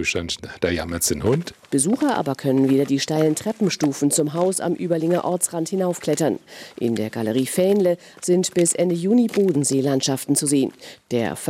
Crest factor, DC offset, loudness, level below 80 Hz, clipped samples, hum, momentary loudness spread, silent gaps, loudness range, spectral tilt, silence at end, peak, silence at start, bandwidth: 16 dB; under 0.1%; -21 LUFS; -54 dBFS; under 0.1%; none; 6 LU; none; 3 LU; -4.5 dB/octave; 0 s; -6 dBFS; 0 s; 16 kHz